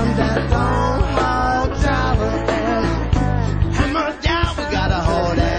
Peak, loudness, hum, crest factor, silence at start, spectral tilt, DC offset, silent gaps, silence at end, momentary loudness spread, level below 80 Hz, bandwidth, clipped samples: -4 dBFS; -19 LUFS; none; 14 dB; 0 s; -6.5 dB/octave; 0.4%; none; 0 s; 2 LU; -24 dBFS; 9 kHz; under 0.1%